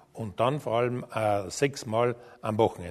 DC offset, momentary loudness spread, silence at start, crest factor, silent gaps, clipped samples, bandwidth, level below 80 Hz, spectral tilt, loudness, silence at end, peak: under 0.1%; 5 LU; 0.15 s; 20 dB; none; under 0.1%; 13.5 kHz; -62 dBFS; -5.5 dB/octave; -28 LUFS; 0 s; -8 dBFS